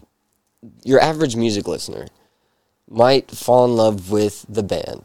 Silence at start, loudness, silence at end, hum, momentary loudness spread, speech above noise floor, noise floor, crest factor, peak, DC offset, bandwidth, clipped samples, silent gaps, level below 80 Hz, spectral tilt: 0.65 s; -18 LUFS; 0.05 s; none; 13 LU; 51 dB; -68 dBFS; 18 dB; 0 dBFS; under 0.1%; 17 kHz; under 0.1%; none; -52 dBFS; -5.5 dB/octave